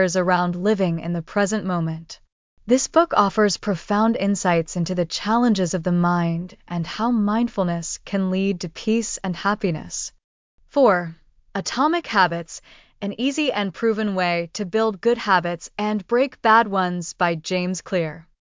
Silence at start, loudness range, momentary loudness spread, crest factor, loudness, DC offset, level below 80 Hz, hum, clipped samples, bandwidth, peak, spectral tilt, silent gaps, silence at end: 0 s; 3 LU; 11 LU; 18 dB; -22 LUFS; under 0.1%; -54 dBFS; none; under 0.1%; 7.8 kHz; -4 dBFS; -5 dB/octave; 2.32-2.57 s, 10.24-10.58 s; 0.4 s